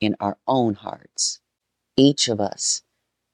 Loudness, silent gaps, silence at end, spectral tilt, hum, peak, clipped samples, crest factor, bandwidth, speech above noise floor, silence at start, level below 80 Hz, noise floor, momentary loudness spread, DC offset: -21 LUFS; none; 0.55 s; -4 dB/octave; none; -2 dBFS; under 0.1%; 20 dB; 10.5 kHz; 58 dB; 0 s; -62 dBFS; -79 dBFS; 12 LU; under 0.1%